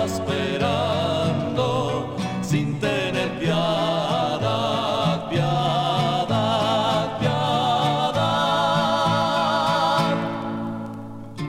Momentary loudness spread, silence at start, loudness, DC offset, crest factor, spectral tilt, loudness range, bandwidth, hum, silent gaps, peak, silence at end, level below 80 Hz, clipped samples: 6 LU; 0 s; -22 LUFS; under 0.1%; 14 dB; -5.5 dB/octave; 2 LU; 16.5 kHz; none; none; -8 dBFS; 0 s; -50 dBFS; under 0.1%